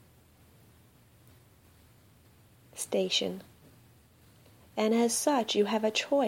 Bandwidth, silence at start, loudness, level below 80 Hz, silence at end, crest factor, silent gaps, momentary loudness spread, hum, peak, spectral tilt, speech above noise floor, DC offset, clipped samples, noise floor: 16.5 kHz; 2.75 s; -29 LUFS; -70 dBFS; 0 s; 18 dB; none; 14 LU; none; -14 dBFS; -3 dB/octave; 32 dB; under 0.1%; under 0.1%; -60 dBFS